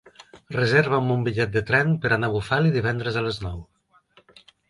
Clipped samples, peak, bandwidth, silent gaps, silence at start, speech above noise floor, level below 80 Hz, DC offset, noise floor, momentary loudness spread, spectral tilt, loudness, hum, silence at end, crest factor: under 0.1%; -6 dBFS; 11.5 kHz; none; 0.35 s; 36 dB; -48 dBFS; under 0.1%; -59 dBFS; 11 LU; -7 dB/octave; -22 LUFS; none; 1.05 s; 18 dB